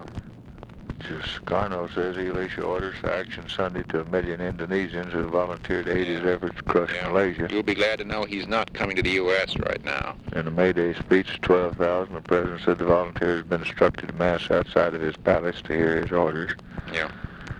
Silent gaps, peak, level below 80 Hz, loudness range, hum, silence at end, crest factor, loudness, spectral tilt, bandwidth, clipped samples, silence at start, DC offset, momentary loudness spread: none; -4 dBFS; -44 dBFS; 5 LU; none; 0 s; 20 dB; -25 LUFS; -6.5 dB/octave; 10.5 kHz; under 0.1%; 0 s; under 0.1%; 9 LU